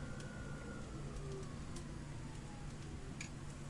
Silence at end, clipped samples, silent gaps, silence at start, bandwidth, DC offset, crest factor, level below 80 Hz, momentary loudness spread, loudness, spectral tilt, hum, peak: 0 s; under 0.1%; none; 0 s; 11.5 kHz; under 0.1%; 16 dB; -54 dBFS; 2 LU; -49 LUFS; -5.5 dB/octave; none; -32 dBFS